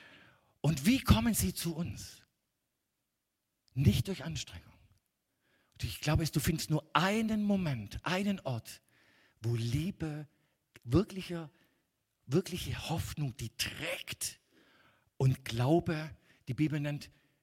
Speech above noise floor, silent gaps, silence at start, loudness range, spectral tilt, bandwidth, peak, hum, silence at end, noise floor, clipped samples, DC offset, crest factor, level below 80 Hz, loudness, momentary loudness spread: 52 dB; none; 0 s; 5 LU; -5.5 dB/octave; 16.5 kHz; -10 dBFS; none; 0.35 s; -85 dBFS; under 0.1%; under 0.1%; 24 dB; -50 dBFS; -34 LUFS; 14 LU